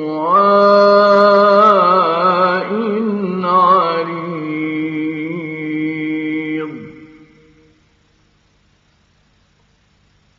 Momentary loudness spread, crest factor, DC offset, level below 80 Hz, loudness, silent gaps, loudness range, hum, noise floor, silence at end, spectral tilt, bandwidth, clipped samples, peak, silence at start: 14 LU; 14 dB; under 0.1%; -64 dBFS; -13 LUFS; none; 15 LU; none; -56 dBFS; 3.3 s; -4 dB/octave; 7 kHz; under 0.1%; 0 dBFS; 0 s